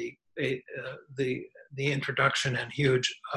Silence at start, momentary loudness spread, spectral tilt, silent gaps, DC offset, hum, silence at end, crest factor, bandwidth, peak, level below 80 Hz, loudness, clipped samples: 0 s; 14 LU; -4.5 dB/octave; none; under 0.1%; none; 0 s; 20 dB; 12 kHz; -10 dBFS; -64 dBFS; -30 LUFS; under 0.1%